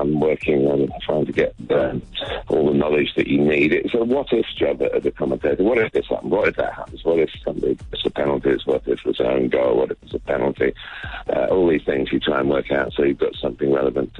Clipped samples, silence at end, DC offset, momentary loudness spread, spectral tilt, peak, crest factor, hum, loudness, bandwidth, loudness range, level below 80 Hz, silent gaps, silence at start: under 0.1%; 0 s; under 0.1%; 7 LU; -7.5 dB/octave; -6 dBFS; 14 dB; none; -20 LUFS; 7.6 kHz; 2 LU; -42 dBFS; none; 0 s